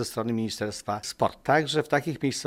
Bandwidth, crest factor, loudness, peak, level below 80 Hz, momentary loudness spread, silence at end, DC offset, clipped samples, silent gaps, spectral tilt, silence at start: 16 kHz; 20 dB; -27 LUFS; -8 dBFS; -60 dBFS; 8 LU; 0 s; under 0.1%; under 0.1%; none; -4.5 dB/octave; 0 s